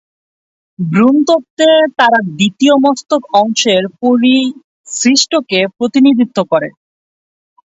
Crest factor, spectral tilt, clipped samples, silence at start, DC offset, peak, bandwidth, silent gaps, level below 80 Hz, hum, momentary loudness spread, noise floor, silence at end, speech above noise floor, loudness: 12 dB; -4 dB/octave; under 0.1%; 0.8 s; under 0.1%; 0 dBFS; 8 kHz; 1.50-1.57 s, 4.64-4.84 s; -60 dBFS; none; 7 LU; under -90 dBFS; 1.05 s; over 79 dB; -11 LUFS